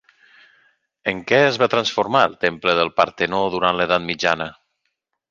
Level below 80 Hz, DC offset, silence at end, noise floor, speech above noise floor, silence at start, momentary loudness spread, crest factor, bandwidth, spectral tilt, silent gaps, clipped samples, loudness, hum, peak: -56 dBFS; under 0.1%; 0.8 s; -75 dBFS; 56 dB; 1.05 s; 8 LU; 20 dB; 7.4 kHz; -4.5 dB/octave; none; under 0.1%; -19 LUFS; none; -2 dBFS